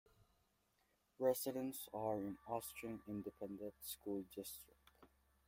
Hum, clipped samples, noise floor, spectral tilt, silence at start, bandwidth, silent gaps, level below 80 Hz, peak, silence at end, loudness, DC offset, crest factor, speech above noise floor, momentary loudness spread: none; under 0.1%; -81 dBFS; -5 dB/octave; 1.2 s; 16.5 kHz; none; -76 dBFS; -24 dBFS; 0.4 s; -46 LUFS; under 0.1%; 22 dB; 36 dB; 11 LU